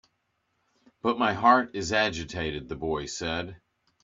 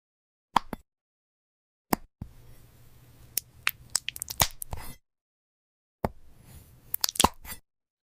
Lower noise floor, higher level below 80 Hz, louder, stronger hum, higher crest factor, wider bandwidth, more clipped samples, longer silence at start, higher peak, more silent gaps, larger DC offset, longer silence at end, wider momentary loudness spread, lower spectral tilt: first, -76 dBFS vs -54 dBFS; second, -54 dBFS vs -48 dBFS; first, -27 LUFS vs -30 LUFS; neither; second, 24 dB vs 30 dB; second, 7.8 kHz vs 16 kHz; neither; first, 1.05 s vs 0.55 s; about the same, -6 dBFS vs -6 dBFS; second, none vs 1.01-1.85 s, 5.21-5.99 s; neither; about the same, 0.45 s vs 0.45 s; second, 12 LU vs 19 LU; first, -4 dB/octave vs -2 dB/octave